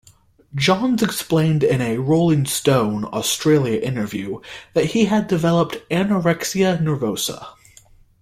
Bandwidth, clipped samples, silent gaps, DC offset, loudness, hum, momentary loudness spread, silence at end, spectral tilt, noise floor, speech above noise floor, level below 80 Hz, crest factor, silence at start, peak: 16 kHz; under 0.1%; none; under 0.1%; -19 LUFS; none; 8 LU; 0.7 s; -5.5 dB/octave; -52 dBFS; 34 dB; -52 dBFS; 16 dB; 0.55 s; -4 dBFS